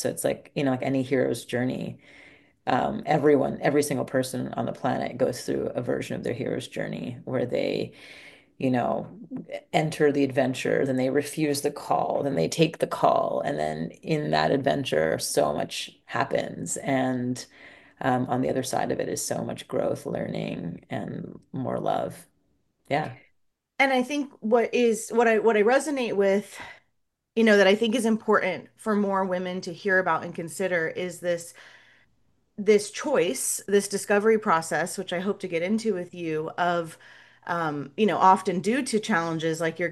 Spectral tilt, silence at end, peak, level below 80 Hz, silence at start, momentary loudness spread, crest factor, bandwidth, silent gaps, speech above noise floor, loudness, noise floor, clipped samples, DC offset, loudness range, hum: -5 dB/octave; 0 s; -4 dBFS; -64 dBFS; 0 s; 11 LU; 22 dB; 12.5 kHz; none; 50 dB; -26 LUFS; -76 dBFS; under 0.1%; under 0.1%; 6 LU; none